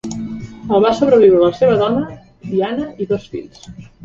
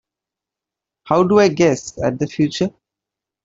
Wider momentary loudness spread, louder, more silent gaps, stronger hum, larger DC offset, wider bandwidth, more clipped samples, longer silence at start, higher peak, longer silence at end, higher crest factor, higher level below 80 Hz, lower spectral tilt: first, 19 LU vs 10 LU; about the same, -15 LUFS vs -17 LUFS; neither; neither; neither; about the same, 7.6 kHz vs 7.8 kHz; neither; second, 0.05 s vs 1.05 s; about the same, 0 dBFS vs -2 dBFS; second, 0.2 s vs 0.75 s; about the same, 16 dB vs 16 dB; about the same, -48 dBFS vs -52 dBFS; about the same, -7 dB/octave vs -6 dB/octave